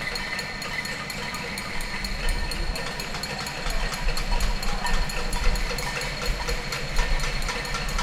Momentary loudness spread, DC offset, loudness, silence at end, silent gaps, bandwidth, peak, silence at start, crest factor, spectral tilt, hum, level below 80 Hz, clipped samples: 3 LU; under 0.1%; -29 LUFS; 0 s; none; 16.5 kHz; -8 dBFS; 0 s; 16 dB; -3 dB/octave; none; -28 dBFS; under 0.1%